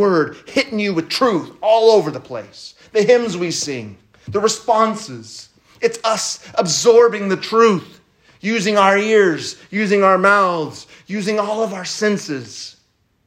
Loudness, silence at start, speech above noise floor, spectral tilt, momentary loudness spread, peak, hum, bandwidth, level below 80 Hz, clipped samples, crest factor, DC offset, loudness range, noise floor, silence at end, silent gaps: -16 LUFS; 0 s; 44 dB; -4 dB/octave; 18 LU; 0 dBFS; none; 14.5 kHz; -64 dBFS; under 0.1%; 16 dB; under 0.1%; 4 LU; -61 dBFS; 0.55 s; none